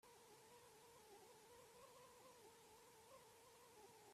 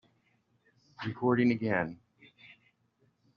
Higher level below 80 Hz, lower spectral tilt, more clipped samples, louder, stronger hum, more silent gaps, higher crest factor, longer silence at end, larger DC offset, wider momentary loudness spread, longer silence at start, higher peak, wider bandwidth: second, under -90 dBFS vs -72 dBFS; second, -2.5 dB/octave vs -6 dB/octave; neither; second, -66 LUFS vs -31 LUFS; neither; neither; second, 14 dB vs 20 dB; second, 0 s vs 1.4 s; neither; second, 2 LU vs 14 LU; second, 0.05 s vs 1 s; second, -54 dBFS vs -14 dBFS; first, 15.5 kHz vs 6.4 kHz